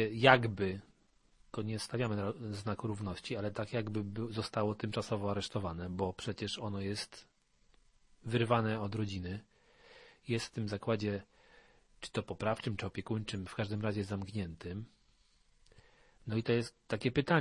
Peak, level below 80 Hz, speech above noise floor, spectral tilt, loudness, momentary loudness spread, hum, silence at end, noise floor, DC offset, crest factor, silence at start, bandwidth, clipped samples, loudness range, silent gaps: -8 dBFS; -64 dBFS; 35 dB; -6 dB/octave; -36 LUFS; 12 LU; none; 0 s; -70 dBFS; under 0.1%; 30 dB; 0 s; 11.5 kHz; under 0.1%; 3 LU; none